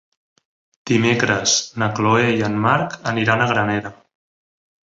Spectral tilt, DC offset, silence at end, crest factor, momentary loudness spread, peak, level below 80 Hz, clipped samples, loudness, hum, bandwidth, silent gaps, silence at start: -4 dB/octave; under 0.1%; 0.9 s; 18 dB; 7 LU; -2 dBFS; -54 dBFS; under 0.1%; -18 LUFS; none; 8 kHz; none; 0.85 s